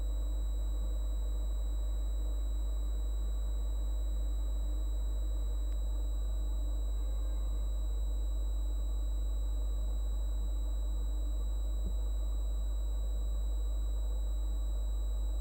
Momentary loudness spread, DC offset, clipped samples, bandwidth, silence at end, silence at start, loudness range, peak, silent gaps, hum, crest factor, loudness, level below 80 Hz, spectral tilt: 0 LU; under 0.1%; under 0.1%; 16 kHz; 0 s; 0 s; 0 LU; -26 dBFS; none; 50 Hz at -35 dBFS; 6 dB; -38 LUFS; -34 dBFS; -6 dB/octave